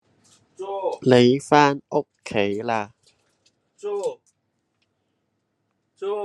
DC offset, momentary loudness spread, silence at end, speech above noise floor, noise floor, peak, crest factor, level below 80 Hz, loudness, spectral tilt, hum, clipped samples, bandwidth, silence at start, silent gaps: under 0.1%; 17 LU; 0 s; 54 dB; -73 dBFS; 0 dBFS; 24 dB; -68 dBFS; -21 LUFS; -6 dB/octave; none; under 0.1%; 11.5 kHz; 0.6 s; none